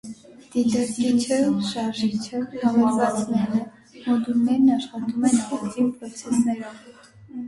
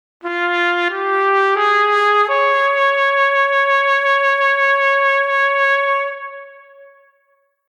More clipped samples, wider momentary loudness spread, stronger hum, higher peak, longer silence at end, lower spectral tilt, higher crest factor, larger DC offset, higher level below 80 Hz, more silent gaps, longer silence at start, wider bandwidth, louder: neither; first, 11 LU vs 5 LU; neither; second, -8 dBFS vs -4 dBFS; second, 0 s vs 1.15 s; first, -5 dB/octave vs 0 dB/octave; about the same, 14 dB vs 12 dB; neither; first, -62 dBFS vs -90 dBFS; neither; second, 0.05 s vs 0.25 s; about the same, 11.5 kHz vs 10.5 kHz; second, -23 LUFS vs -14 LUFS